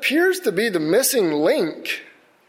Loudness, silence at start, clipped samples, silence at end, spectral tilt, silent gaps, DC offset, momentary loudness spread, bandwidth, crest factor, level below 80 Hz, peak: -20 LUFS; 0 s; under 0.1%; 0.4 s; -3 dB/octave; none; under 0.1%; 10 LU; 16.5 kHz; 14 dB; -68 dBFS; -6 dBFS